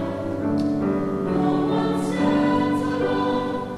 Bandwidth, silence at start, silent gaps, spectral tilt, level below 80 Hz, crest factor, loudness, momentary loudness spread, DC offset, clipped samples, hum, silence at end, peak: 12 kHz; 0 s; none; -7.5 dB/octave; -50 dBFS; 12 dB; -22 LUFS; 4 LU; under 0.1%; under 0.1%; none; 0 s; -10 dBFS